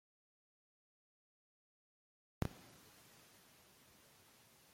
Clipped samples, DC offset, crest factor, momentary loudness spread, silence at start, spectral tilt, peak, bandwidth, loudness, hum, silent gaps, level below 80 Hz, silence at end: under 0.1%; under 0.1%; 34 dB; 19 LU; 2.4 s; -5.5 dB/octave; -22 dBFS; 16.5 kHz; -51 LUFS; none; none; -66 dBFS; 0 s